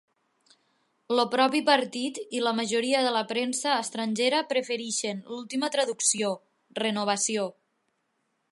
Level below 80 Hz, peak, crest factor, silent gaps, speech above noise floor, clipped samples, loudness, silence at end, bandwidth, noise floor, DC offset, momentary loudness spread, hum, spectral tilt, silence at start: -82 dBFS; -6 dBFS; 22 dB; none; 49 dB; under 0.1%; -27 LUFS; 1 s; 11.5 kHz; -76 dBFS; under 0.1%; 9 LU; none; -2 dB/octave; 1.1 s